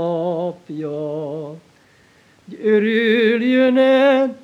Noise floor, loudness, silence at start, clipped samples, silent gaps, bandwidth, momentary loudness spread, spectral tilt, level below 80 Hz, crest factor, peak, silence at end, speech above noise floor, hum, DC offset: -53 dBFS; -17 LUFS; 0 s; under 0.1%; none; 7.4 kHz; 15 LU; -7 dB/octave; -72 dBFS; 14 dB; -4 dBFS; 0.05 s; 36 dB; none; under 0.1%